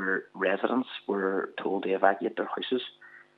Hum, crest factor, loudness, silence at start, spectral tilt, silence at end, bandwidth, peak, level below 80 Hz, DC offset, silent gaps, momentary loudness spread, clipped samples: none; 24 dB; -29 LUFS; 0 s; -7.5 dB/octave; 0.15 s; 4.9 kHz; -6 dBFS; under -90 dBFS; under 0.1%; none; 7 LU; under 0.1%